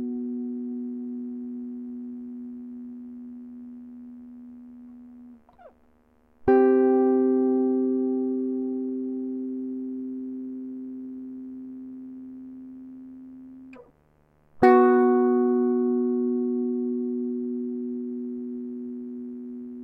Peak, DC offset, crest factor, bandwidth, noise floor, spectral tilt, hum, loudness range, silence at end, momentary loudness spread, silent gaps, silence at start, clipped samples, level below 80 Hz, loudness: -6 dBFS; under 0.1%; 22 dB; 4.8 kHz; -62 dBFS; -9 dB/octave; none; 19 LU; 0 s; 24 LU; none; 0 s; under 0.1%; -62 dBFS; -25 LUFS